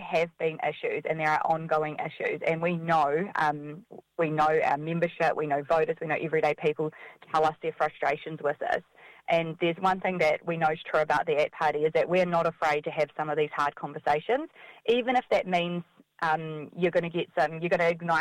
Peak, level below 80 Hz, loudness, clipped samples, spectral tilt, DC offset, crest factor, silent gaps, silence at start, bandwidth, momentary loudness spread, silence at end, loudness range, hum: -12 dBFS; -66 dBFS; -28 LUFS; under 0.1%; -6 dB/octave; under 0.1%; 16 dB; none; 0 s; 12.5 kHz; 7 LU; 0 s; 2 LU; none